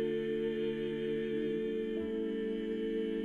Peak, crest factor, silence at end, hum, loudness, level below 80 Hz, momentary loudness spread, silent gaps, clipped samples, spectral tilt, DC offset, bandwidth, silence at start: -24 dBFS; 10 dB; 0 s; none; -36 LUFS; -60 dBFS; 2 LU; none; under 0.1%; -7.5 dB/octave; under 0.1%; 4.5 kHz; 0 s